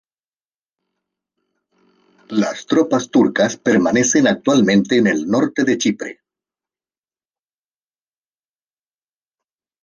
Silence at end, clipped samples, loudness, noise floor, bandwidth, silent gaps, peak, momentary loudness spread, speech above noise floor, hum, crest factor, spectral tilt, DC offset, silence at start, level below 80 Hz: 3.7 s; under 0.1%; -16 LUFS; under -90 dBFS; 10 kHz; none; -2 dBFS; 7 LU; over 74 dB; none; 16 dB; -4.5 dB/octave; under 0.1%; 2.3 s; -62 dBFS